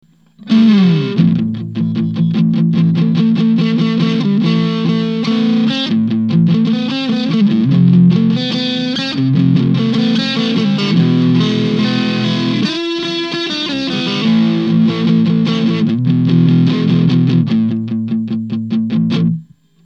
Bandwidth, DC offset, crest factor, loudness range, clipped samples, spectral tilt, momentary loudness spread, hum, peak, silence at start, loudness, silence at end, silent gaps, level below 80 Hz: 7.4 kHz; 0.1%; 12 dB; 2 LU; under 0.1%; -7.5 dB/octave; 7 LU; none; 0 dBFS; 0.4 s; -13 LUFS; 0.45 s; none; -52 dBFS